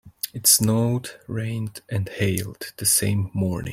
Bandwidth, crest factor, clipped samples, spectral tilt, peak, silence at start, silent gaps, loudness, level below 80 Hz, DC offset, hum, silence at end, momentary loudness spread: 16.5 kHz; 20 dB; under 0.1%; -3.5 dB/octave; -4 dBFS; 0.05 s; none; -22 LUFS; -54 dBFS; under 0.1%; none; 0 s; 14 LU